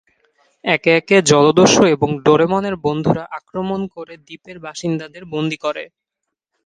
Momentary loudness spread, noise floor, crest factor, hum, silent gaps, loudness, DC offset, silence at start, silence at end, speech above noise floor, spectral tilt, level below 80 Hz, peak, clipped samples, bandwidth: 20 LU; -80 dBFS; 18 dB; none; none; -16 LUFS; under 0.1%; 0.65 s; 0.8 s; 64 dB; -4.5 dB/octave; -52 dBFS; 0 dBFS; under 0.1%; 10 kHz